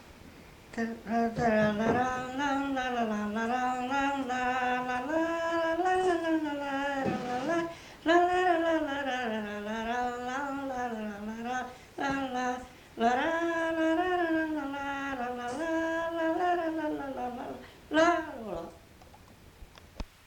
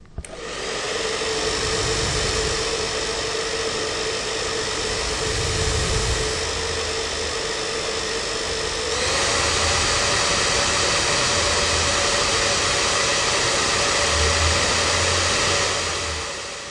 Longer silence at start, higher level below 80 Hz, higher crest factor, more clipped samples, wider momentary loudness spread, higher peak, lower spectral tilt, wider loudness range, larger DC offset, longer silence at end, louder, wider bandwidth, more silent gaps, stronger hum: about the same, 0 s vs 0 s; second, -56 dBFS vs -36 dBFS; about the same, 18 dB vs 16 dB; neither; first, 11 LU vs 6 LU; second, -14 dBFS vs -6 dBFS; first, -5 dB/octave vs -2 dB/octave; about the same, 4 LU vs 5 LU; neither; first, 0.2 s vs 0 s; second, -31 LUFS vs -20 LUFS; first, 19 kHz vs 11.5 kHz; neither; neither